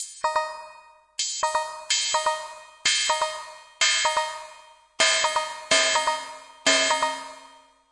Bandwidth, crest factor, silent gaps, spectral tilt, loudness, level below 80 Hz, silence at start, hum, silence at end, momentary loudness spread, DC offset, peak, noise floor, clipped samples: 11.5 kHz; 20 dB; none; 1.5 dB/octave; -23 LUFS; -68 dBFS; 0 s; none; 0.4 s; 18 LU; under 0.1%; -6 dBFS; -52 dBFS; under 0.1%